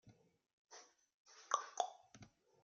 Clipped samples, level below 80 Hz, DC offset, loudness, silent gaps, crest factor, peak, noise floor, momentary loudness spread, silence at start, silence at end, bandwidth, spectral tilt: under 0.1%; -88 dBFS; under 0.1%; -43 LUFS; 0.53-0.65 s, 1.14-1.25 s; 32 dB; -18 dBFS; -65 dBFS; 22 LU; 0.05 s; 0.35 s; 7.6 kHz; -0.5 dB/octave